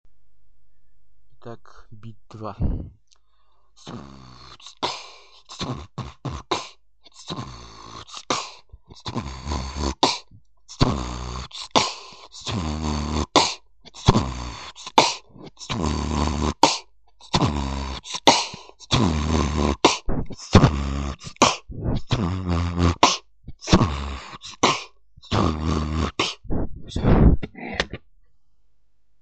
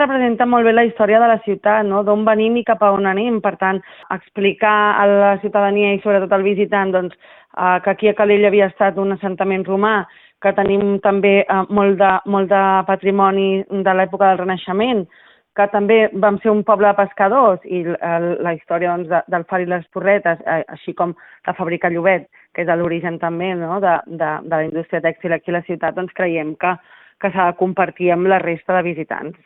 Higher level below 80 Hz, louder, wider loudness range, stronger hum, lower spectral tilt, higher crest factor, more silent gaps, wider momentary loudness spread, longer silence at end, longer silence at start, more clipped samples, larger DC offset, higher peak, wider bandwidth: first, -32 dBFS vs -58 dBFS; second, -23 LUFS vs -16 LUFS; first, 13 LU vs 5 LU; neither; second, -4.5 dB/octave vs -11 dB/octave; first, 24 dB vs 16 dB; neither; first, 21 LU vs 9 LU; first, 1.25 s vs 0.15 s; about the same, 0.05 s vs 0 s; neither; first, 0.3% vs under 0.1%; about the same, 0 dBFS vs 0 dBFS; first, 9 kHz vs 4 kHz